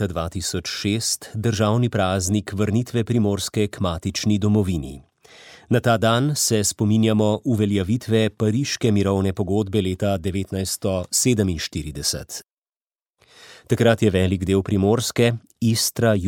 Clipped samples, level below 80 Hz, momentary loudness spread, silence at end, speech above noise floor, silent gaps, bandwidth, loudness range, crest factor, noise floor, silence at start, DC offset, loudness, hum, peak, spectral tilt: under 0.1%; -46 dBFS; 7 LU; 0 s; over 69 dB; none; 17.5 kHz; 3 LU; 18 dB; under -90 dBFS; 0 s; under 0.1%; -21 LUFS; none; -2 dBFS; -5 dB/octave